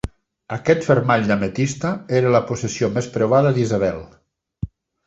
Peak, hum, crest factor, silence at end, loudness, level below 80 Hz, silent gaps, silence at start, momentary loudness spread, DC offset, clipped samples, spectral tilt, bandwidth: -2 dBFS; none; 18 dB; 0.4 s; -19 LUFS; -44 dBFS; none; 0.05 s; 17 LU; under 0.1%; under 0.1%; -6.5 dB/octave; 8.2 kHz